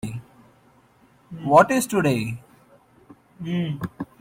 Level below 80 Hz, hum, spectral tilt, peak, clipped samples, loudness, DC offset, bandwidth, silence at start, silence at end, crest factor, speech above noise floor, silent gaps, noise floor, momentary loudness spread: -58 dBFS; none; -6 dB/octave; -2 dBFS; under 0.1%; -21 LUFS; under 0.1%; 16.5 kHz; 0.05 s; 0.15 s; 22 dB; 37 dB; none; -57 dBFS; 22 LU